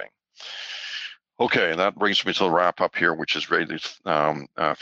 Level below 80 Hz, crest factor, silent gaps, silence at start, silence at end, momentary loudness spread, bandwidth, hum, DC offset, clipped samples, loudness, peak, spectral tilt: -66 dBFS; 20 dB; none; 0 s; 0 s; 14 LU; 8 kHz; none; under 0.1%; under 0.1%; -23 LUFS; -4 dBFS; -4 dB/octave